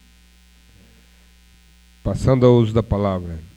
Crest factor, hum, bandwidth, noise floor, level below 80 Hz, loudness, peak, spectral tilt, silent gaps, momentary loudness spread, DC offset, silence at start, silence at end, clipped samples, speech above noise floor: 20 dB; none; 10 kHz; -51 dBFS; -36 dBFS; -18 LUFS; 0 dBFS; -8.5 dB/octave; none; 14 LU; under 0.1%; 2.05 s; 0.1 s; under 0.1%; 34 dB